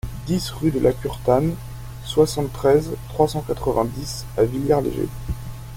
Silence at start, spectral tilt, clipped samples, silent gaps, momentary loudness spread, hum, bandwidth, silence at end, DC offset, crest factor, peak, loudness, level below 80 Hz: 0.05 s; -6.5 dB/octave; under 0.1%; none; 12 LU; none; 17 kHz; 0 s; under 0.1%; 18 dB; -4 dBFS; -22 LUFS; -36 dBFS